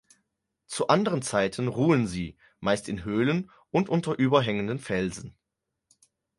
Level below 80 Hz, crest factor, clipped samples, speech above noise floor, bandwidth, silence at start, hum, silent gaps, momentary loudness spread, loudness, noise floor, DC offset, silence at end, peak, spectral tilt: -56 dBFS; 22 dB; under 0.1%; 58 dB; 11.5 kHz; 0.7 s; none; none; 10 LU; -27 LUFS; -84 dBFS; under 0.1%; 1.05 s; -6 dBFS; -6 dB/octave